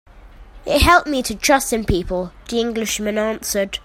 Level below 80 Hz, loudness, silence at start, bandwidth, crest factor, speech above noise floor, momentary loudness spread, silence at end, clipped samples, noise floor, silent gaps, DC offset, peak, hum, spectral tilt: -32 dBFS; -18 LUFS; 0.15 s; 16.5 kHz; 20 dB; 23 dB; 11 LU; 0.05 s; under 0.1%; -41 dBFS; none; under 0.1%; 0 dBFS; none; -3.5 dB/octave